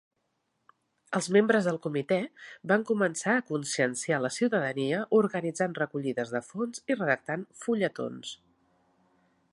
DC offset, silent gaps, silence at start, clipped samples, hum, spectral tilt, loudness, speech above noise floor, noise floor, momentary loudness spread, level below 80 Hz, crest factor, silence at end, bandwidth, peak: under 0.1%; none; 1.1 s; under 0.1%; none; -5 dB/octave; -29 LUFS; 49 dB; -78 dBFS; 10 LU; -78 dBFS; 20 dB; 1.2 s; 11.5 kHz; -10 dBFS